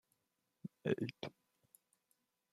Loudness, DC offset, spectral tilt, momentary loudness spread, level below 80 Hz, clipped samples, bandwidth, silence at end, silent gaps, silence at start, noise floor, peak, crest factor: -43 LUFS; under 0.1%; -7 dB/octave; 15 LU; -84 dBFS; under 0.1%; 15 kHz; 1.2 s; none; 0.65 s; -86 dBFS; -22 dBFS; 26 dB